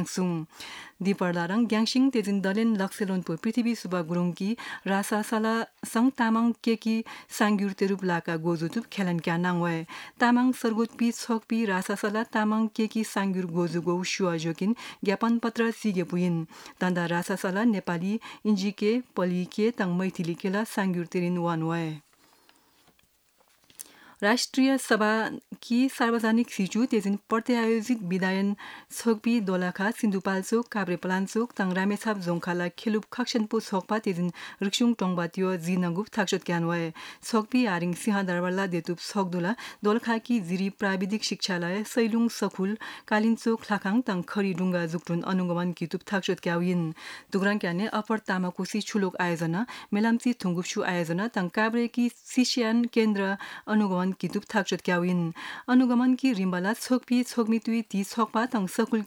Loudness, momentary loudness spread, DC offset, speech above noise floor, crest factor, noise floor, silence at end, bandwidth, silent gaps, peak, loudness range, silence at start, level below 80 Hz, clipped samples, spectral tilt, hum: -27 LUFS; 6 LU; under 0.1%; 39 dB; 18 dB; -66 dBFS; 0 s; 18 kHz; none; -10 dBFS; 3 LU; 0 s; -76 dBFS; under 0.1%; -5.5 dB/octave; none